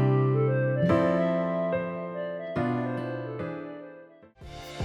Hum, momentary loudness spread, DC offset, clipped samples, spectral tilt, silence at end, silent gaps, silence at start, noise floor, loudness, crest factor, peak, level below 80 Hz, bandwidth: none; 17 LU; under 0.1%; under 0.1%; -9 dB/octave; 0 s; none; 0 s; -50 dBFS; -28 LUFS; 16 dB; -12 dBFS; -58 dBFS; 7.6 kHz